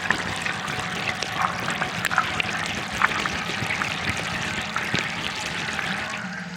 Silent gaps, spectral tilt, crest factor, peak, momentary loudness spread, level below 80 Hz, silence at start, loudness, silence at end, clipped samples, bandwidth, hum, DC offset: none; -3 dB/octave; 26 dB; -2 dBFS; 4 LU; -50 dBFS; 0 s; -25 LUFS; 0 s; under 0.1%; 17 kHz; none; under 0.1%